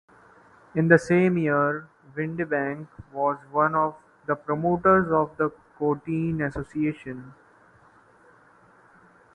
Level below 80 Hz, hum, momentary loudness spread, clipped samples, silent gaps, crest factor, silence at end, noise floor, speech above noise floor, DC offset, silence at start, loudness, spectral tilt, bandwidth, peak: -56 dBFS; none; 16 LU; under 0.1%; none; 24 dB; 2.05 s; -56 dBFS; 32 dB; under 0.1%; 0.75 s; -24 LUFS; -8.5 dB/octave; 11 kHz; -2 dBFS